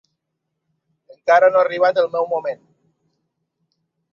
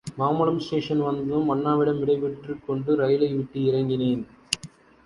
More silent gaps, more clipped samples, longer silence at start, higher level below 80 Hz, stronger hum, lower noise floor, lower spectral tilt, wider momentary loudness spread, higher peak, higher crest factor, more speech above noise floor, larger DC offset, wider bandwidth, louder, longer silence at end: neither; neither; first, 1.25 s vs 0.05 s; second, -74 dBFS vs -58 dBFS; neither; first, -77 dBFS vs -46 dBFS; second, -4.5 dB/octave vs -6.5 dB/octave; first, 15 LU vs 8 LU; about the same, -2 dBFS vs -2 dBFS; about the same, 18 dB vs 22 dB; first, 61 dB vs 23 dB; neither; second, 6.8 kHz vs 11.5 kHz; first, -17 LUFS vs -25 LUFS; first, 1.6 s vs 0.4 s